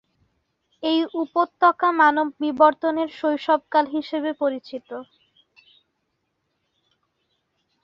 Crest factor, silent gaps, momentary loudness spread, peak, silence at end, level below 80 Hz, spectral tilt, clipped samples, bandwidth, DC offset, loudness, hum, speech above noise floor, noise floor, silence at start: 20 dB; none; 14 LU; -2 dBFS; 2.8 s; -72 dBFS; -5 dB/octave; under 0.1%; 6.8 kHz; under 0.1%; -21 LUFS; none; 54 dB; -75 dBFS; 0.8 s